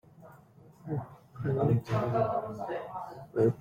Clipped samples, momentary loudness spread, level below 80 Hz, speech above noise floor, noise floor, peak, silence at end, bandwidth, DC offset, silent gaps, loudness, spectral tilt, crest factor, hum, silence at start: under 0.1%; 13 LU; -62 dBFS; 26 dB; -56 dBFS; -14 dBFS; 0 s; 7.2 kHz; under 0.1%; none; -32 LUFS; -9 dB/octave; 18 dB; none; 0.2 s